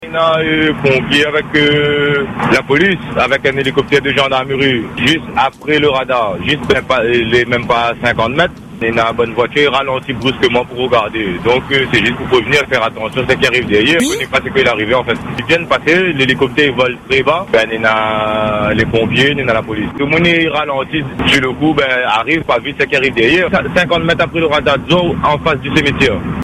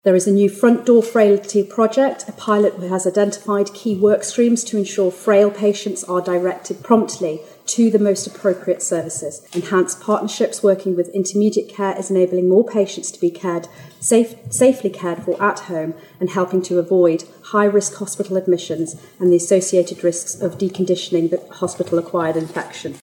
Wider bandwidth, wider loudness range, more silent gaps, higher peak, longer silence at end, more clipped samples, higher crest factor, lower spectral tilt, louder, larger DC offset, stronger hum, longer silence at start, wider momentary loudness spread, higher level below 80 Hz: second, 14.5 kHz vs 17 kHz; about the same, 1 LU vs 2 LU; neither; about the same, 0 dBFS vs -2 dBFS; about the same, 0 s vs 0.05 s; neither; about the same, 12 dB vs 14 dB; about the same, -5 dB/octave vs -5 dB/octave; first, -12 LUFS vs -18 LUFS; neither; neither; about the same, 0 s vs 0.05 s; second, 4 LU vs 10 LU; first, -38 dBFS vs -70 dBFS